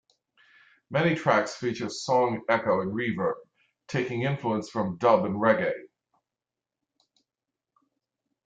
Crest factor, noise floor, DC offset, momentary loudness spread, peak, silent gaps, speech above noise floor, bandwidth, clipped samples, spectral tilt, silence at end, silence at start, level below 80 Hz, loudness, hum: 20 dB; -89 dBFS; under 0.1%; 8 LU; -8 dBFS; none; 64 dB; 9.2 kHz; under 0.1%; -6 dB/octave; 2.6 s; 0.9 s; -68 dBFS; -26 LUFS; none